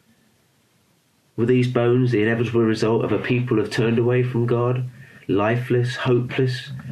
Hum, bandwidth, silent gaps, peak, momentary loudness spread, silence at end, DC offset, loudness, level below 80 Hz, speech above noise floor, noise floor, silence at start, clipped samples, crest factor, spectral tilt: none; 10.5 kHz; none; -6 dBFS; 6 LU; 0 s; under 0.1%; -21 LUFS; -58 dBFS; 42 dB; -62 dBFS; 1.35 s; under 0.1%; 14 dB; -7.5 dB/octave